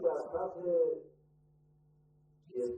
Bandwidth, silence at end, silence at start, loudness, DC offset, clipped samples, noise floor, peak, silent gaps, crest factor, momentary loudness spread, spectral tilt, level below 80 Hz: 8.6 kHz; 0 s; 0 s; -35 LUFS; under 0.1%; under 0.1%; -67 dBFS; -20 dBFS; none; 18 dB; 11 LU; -8 dB/octave; -72 dBFS